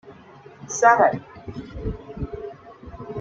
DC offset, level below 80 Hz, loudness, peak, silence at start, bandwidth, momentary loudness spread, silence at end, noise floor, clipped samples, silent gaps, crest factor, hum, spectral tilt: under 0.1%; -42 dBFS; -22 LUFS; -2 dBFS; 0.05 s; 7.8 kHz; 25 LU; 0 s; -46 dBFS; under 0.1%; none; 22 dB; none; -5 dB/octave